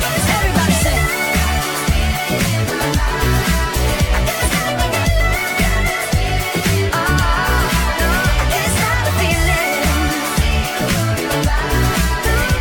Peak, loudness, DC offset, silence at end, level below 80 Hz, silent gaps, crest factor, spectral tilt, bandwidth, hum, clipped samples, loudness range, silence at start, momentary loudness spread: -2 dBFS; -16 LUFS; under 0.1%; 0 s; -20 dBFS; none; 14 dB; -4 dB/octave; 18 kHz; none; under 0.1%; 1 LU; 0 s; 2 LU